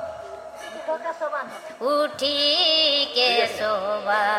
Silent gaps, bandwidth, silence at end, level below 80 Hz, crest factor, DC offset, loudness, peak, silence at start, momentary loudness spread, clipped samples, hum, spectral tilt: none; 16 kHz; 0 s; -66 dBFS; 16 dB; under 0.1%; -21 LUFS; -8 dBFS; 0 s; 19 LU; under 0.1%; none; -1.5 dB/octave